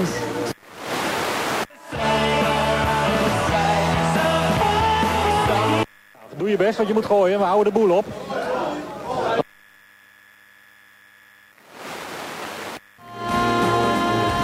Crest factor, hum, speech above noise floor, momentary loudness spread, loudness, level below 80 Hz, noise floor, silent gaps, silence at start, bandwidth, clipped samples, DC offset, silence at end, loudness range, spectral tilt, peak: 16 dB; none; 33 dB; 13 LU; -21 LUFS; -42 dBFS; -51 dBFS; none; 0 s; 16 kHz; under 0.1%; under 0.1%; 0 s; 12 LU; -5 dB/octave; -6 dBFS